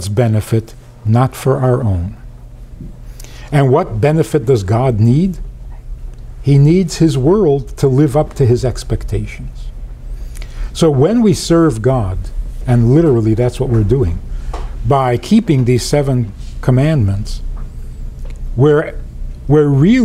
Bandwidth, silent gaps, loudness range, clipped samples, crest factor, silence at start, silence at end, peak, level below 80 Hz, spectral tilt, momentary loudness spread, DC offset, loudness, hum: 14.5 kHz; none; 4 LU; under 0.1%; 12 dB; 0 s; 0 s; -2 dBFS; -26 dBFS; -7.5 dB/octave; 20 LU; under 0.1%; -13 LUFS; none